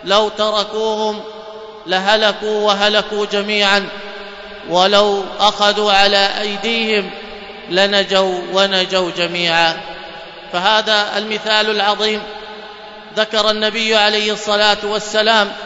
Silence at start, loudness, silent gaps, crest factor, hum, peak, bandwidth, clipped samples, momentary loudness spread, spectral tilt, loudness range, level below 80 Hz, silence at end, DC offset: 0 s; -14 LUFS; none; 16 dB; none; 0 dBFS; 11 kHz; under 0.1%; 18 LU; -2.5 dB/octave; 2 LU; -50 dBFS; 0 s; under 0.1%